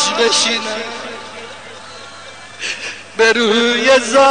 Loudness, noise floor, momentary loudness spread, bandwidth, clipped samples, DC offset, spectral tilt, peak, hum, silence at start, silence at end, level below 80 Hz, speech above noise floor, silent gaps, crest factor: -14 LUFS; -35 dBFS; 21 LU; 10 kHz; under 0.1%; 0.6%; -1.5 dB/octave; -2 dBFS; none; 0 s; 0 s; -60 dBFS; 22 dB; none; 14 dB